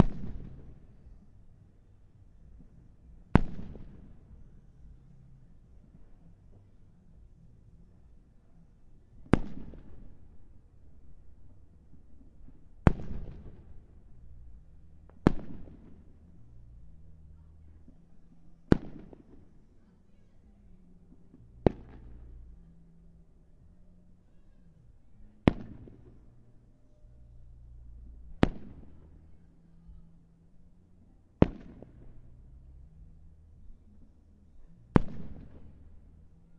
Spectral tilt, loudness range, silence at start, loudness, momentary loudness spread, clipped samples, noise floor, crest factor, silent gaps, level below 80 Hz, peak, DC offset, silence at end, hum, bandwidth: -9 dB/octave; 14 LU; 0 s; -31 LUFS; 29 LU; under 0.1%; -59 dBFS; 36 dB; none; -46 dBFS; 0 dBFS; under 0.1%; 0.3 s; none; 9.4 kHz